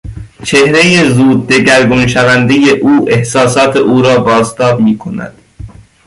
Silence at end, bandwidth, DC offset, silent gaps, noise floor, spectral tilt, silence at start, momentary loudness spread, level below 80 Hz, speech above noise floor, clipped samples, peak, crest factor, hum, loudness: 0.4 s; 11.5 kHz; under 0.1%; none; -30 dBFS; -5 dB/octave; 0.05 s; 10 LU; -36 dBFS; 22 dB; under 0.1%; 0 dBFS; 8 dB; none; -8 LUFS